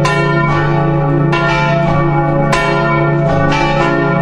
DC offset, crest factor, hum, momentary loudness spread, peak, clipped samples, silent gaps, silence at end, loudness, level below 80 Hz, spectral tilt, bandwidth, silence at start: under 0.1%; 12 dB; none; 1 LU; 0 dBFS; under 0.1%; none; 0 s; -12 LUFS; -28 dBFS; -7 dB/octave; 9.8 kHz; 0 s